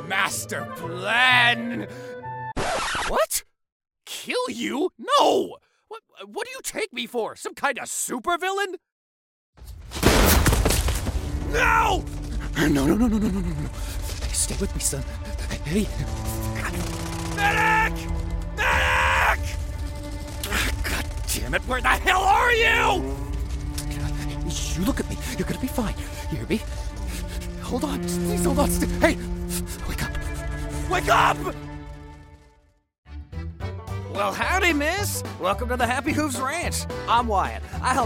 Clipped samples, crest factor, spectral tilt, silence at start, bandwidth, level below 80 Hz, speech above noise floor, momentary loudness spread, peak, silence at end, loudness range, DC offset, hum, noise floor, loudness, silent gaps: under 0.1%; 22 dB; -4 dB/octave; 0 s; 16.5 kHz; -32 dBFS; 36 dB; 14 LU; -2 dBFS; 0 s; 6 LU; under 0.1%; none; -59 dBFS; -24 LUFS; 3.72-3.80 s, 8.92-9.53 s, 32.98-33.03 s